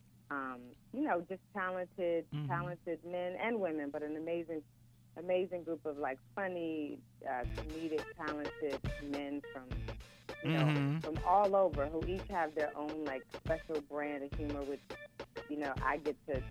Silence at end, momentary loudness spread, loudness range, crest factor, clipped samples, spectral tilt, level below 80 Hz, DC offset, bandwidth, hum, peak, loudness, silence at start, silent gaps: 0 s; 13 LU; 6 LU; 20 dB; under 0.1%; -7.5 dB/octave; -54 dBFS; under 0.1%; 15 kHz; none; -18 dBFS; -38 LUFS; 0.3 s; none